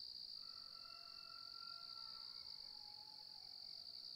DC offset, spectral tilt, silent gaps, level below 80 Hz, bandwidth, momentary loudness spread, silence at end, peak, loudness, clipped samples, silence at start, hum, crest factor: under 0.1%; -1 dB/octave; none; -84 dBFS; 16 kHz; 3 LU; 0 s; -42 dBFS; -52 LUFS; under 0.1%; 0 s; none; 14 dB